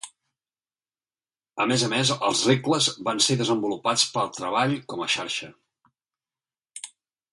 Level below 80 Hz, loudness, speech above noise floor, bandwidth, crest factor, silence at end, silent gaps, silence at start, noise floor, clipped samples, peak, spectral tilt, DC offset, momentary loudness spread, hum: -68 dBFS; -23 LUFS; over 66 dB; 11.5 kHz; 22 dB; 0.45 s; none; 0.05 s; under -90 dBFS; under 0.1%; -6 dBFS; -3 dB/octave; under 0.1%; 19 LU; none